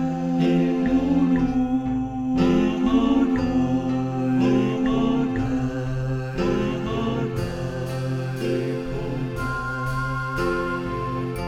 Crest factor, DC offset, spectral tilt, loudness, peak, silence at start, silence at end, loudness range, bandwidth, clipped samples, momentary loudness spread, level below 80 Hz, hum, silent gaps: 14 dB; under 0.1%; -7.5 dB/octave; -23 LUFS; -8 dBFS; 0 s; 0 s; 5 LU; 11.5 kHz; under 0.1%; 7 LU; -38 dBFS; none; none